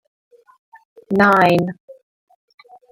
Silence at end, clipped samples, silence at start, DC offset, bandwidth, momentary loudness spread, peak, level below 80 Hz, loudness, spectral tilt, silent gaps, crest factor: 1 s; under 0.1%; 1.1 s; under 0.1%; 16.5 kHz; 16 LU; -2 dBFS; -58 dBFS; -15 LUFS; -7 dB/octave; 1.80-1.88 s; 18 dB